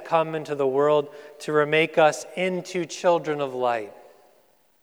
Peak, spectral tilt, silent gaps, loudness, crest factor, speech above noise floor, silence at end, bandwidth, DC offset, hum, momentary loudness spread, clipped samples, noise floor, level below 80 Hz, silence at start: -6 dBFS; -4.5 dB/octave; none; -23 LUFS; 18 dB; 39 dB; 0.9 s; 15.5 kHz; under 0.1%; none; 10 LU; under 0.1%; -62 dBFS; -86 dBFS; 0 s